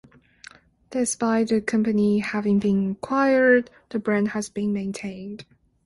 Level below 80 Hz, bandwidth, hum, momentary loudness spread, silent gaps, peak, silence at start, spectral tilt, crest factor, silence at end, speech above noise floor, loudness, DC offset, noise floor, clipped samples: -60 dBFS; 11.5 kHz; none; 14 LU; none; -6 dBFS; 0.9 s; -5.5 dB/octave; 16 dB; 0.45 s; 27 dB; -23 LUFS; under 0.1%; -49 dBFS; under 0.1%